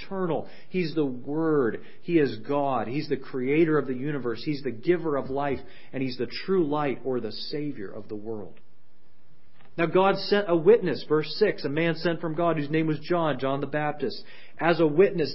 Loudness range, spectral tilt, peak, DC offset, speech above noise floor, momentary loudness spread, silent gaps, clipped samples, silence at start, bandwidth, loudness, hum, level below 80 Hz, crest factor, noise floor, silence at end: 6 LU; -10.5 dB/octave; -6 dBFS; 2%; 39 dB; 11 LU; none; under 0.1%; 0 s; 5.8 kHz; -26 LUFS; none; -64 dBFS; 20 dB; -65 dBFS; 0 s